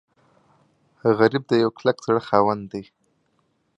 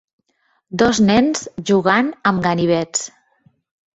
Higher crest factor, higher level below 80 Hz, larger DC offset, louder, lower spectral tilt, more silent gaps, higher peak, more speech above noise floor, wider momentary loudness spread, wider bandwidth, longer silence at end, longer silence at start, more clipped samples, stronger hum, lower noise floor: about the same, 22 dB vs 18 dB; second, -62 dBFS vs -50 dBFS; neither; second, -21 LUFS vs -17 LUFS; first, -7 dB/octave vs -4.5 dB/octave; neither; about the same, -2 dBFS vs -2 dBFS; about the same, 48 dB vs 49 dB; about the same, 11 LU vs 10 LU; about the same, 8 kHz vs 8.2 kHz; about the same, 0.95 s vs 0.9 s; first, 1.05 s vs 0.7 s; neither; neither; about the same, -68 dBFS vs -65 dBFS